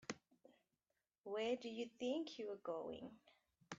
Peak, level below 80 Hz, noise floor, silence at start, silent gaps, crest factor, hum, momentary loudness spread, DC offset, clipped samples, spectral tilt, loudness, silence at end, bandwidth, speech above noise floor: -28 dBFS; -86 dBFS; under -90 dBFS; 0 s; 1.18-1.24 s; 20 dB; none; 13 LU; under 0.1%; under 0.1%; -3 dB/octave; -47 LUFS; 0 s; 8 kHz; over 44 dB